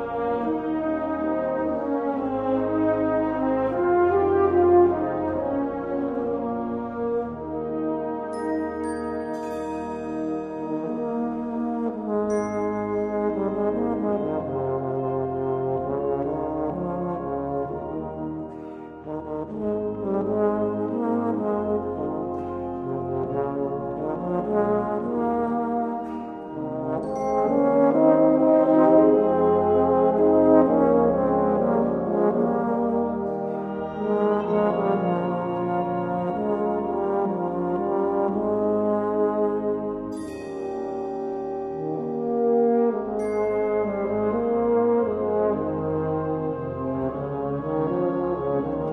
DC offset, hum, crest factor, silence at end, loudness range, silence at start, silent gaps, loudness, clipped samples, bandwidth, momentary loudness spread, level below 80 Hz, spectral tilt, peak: under 0.1%; none; 20 dB; 0 s; 9 LU; 0 s; none; -24 LUFS; under 0.1%; 10.5 kHz; 11 LU; -52 dBFS; -9 dB/octave; -4 dBFS